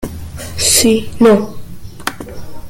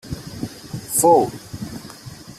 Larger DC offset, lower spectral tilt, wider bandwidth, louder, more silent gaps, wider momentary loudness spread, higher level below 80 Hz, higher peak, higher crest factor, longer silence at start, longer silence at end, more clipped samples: neither; second, -3 dB/octave vs -4.5 dB/octave; about the same, 17 kHz vs 16 kHz; first, -12 LUFS vs -18 LUFS; neither; about the same, 21 LU vs 21 LU; first, -36 dBFS vs -48 dBFS; about the same, 0 dBFS vs -2 dBFS; second, 14 dB vs 20 dB; about the same, 0 s vs 0.05 s; about the same, 0 s vs 0.05 s; neither